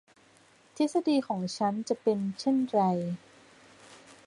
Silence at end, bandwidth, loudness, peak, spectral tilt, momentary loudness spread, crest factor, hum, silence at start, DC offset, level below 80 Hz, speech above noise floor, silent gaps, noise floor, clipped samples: 0.3 s; 11 kHz; -29 LUFS; -14 dBFS; -6.5 dB/octave; 7 LU; 18 dB; none; 0.75 s; under 0.1%; -76 dBFS; 32 dB; none; -61 dBFS; under 0.1%